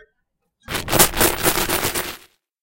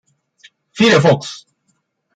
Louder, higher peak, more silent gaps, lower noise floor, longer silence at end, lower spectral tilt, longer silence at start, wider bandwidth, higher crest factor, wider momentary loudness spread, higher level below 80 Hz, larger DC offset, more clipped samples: second, -18 LUFS vs -13 LUFS; about the same, 0 dBFS vs -2 dBFS; neither; first, -73 dBFS vs -66 dBFS; second, 0.45 s vs 0.8 s; second, -2 dB/octave vs -5.5 dB/octave; about the same, 0.7 s vs 0.75 s; first, 17.5 kHz vs 9.2 kHz; first, 22 dB vs 16 dB; second, 15 LU vs 25 LU; first, -36 dBFS vs -56 dBFS; neither; neither